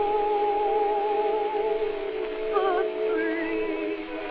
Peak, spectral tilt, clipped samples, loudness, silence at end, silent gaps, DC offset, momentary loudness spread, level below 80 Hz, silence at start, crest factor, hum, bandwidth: -12 dBFS; -1.5 dB/octave; under 0.1%; -26 LUFS; 0 s; none; under 0.1%; 6 LU; -50 dBFS; 0 s; 14 dB; none; 5 kHz